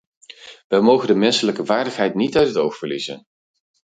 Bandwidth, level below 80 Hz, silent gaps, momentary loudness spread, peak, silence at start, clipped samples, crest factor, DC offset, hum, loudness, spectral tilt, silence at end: 9.4 kHz; -58 dBFS; 0.64-0.70 s; 12 LU; -2 dBFS; 0.45 s; under 0.1%; 18 dB; under 0.1%; none; -18 LUFS; -5 dB/octave; 0.75 s